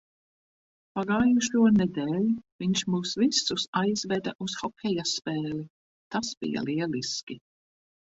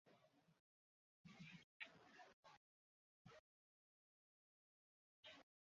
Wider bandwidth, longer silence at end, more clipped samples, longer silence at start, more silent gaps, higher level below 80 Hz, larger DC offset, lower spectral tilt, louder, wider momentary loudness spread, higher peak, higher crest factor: first, 8 kHz vs 7.2 kHz; first, 0.7 s vs 0.35 s; neither; first, 0.95 s vs 0.05 s; second, 2.52-2.59 s, 3.68-3.73 s, 4.35-4.39 s, 5.70-6.11 s, 6.37-6.41 s, 7.23-7.27 s vs 0.59-1.24 s, 1.64-1.80 s, 2.33-2.43 s, 2.57-3.25 s, 3.39-5.23 s; first, -62 dBFS vs under -90 dBFS; neither; first, -4.5 dB/octave vs -2.5 dB/octave; first, -27 LUFS vs -64 LUFS; about the same, 12 LU vs 10 LU; first, -10 dBFS vs -40 dBFS; second, 18 dB vs 30 dB